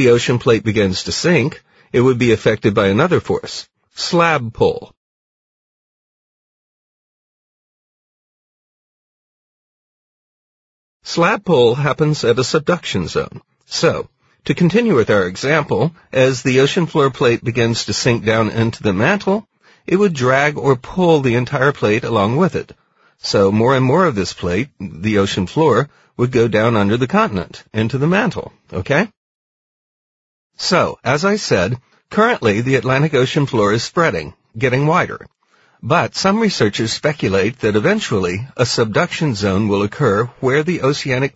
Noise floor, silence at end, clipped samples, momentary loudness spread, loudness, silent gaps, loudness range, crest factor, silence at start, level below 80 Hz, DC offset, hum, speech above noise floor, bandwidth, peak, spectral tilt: -55 dBFS; 0.05 s; under 0.1%; 9 LU; -16 LUFS; 4.97-11.00 s, 29.17-30.50 s; 4 LU; 16 dB; 0 s; -48 dBFS; under 0.1%; none; 40 dB; 8 kHz; 0 dBFS; -5.5 dB/octave